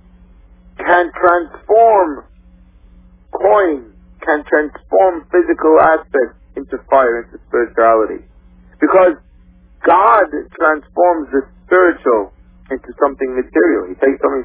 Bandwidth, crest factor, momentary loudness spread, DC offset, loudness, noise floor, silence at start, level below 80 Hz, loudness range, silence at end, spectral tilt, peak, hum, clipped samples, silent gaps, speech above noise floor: 4 kHz; 14 dB; 14 LU; under 0.1%; -14 LUFS; -45 dBFS; 0.8 s; -44 dBFS; 2 LU; 0 s; -9 dB/octave; 0 dBFS; none; under 0.1%; none; 32 dB